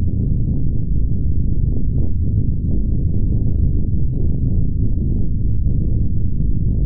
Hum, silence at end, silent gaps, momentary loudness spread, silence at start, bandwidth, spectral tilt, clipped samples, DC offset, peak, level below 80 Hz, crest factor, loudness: none; 0 s; none; 2 LU; 0 s; 0.9 kHz; -18 dB/octave; under 0.1%; 10%; -4 dBFS; -20 dBFS; 10 dB; -20 LUFS